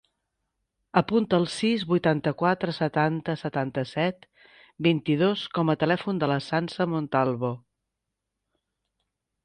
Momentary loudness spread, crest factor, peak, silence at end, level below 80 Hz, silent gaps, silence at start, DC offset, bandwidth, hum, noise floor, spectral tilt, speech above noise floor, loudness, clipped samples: 6 LU; 20 dB; -6 dBFS; 1.85 s; -64 dBFS; none; 0.95 s; under 0.1%; 10 kHz; none; -84 dBFS; -7 dB/octave; 59 dB; -26 LUFS; under 0.1%